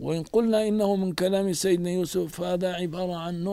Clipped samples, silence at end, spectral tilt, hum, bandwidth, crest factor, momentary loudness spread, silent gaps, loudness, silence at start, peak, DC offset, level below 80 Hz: under 0.1%; 0 s; -5.5 dB/octave; none; 16 kHz; 14 dB; 6 LU; none; -26 LUFS; 0 s; -10 dBFS; under 0.1%; -56 dBFS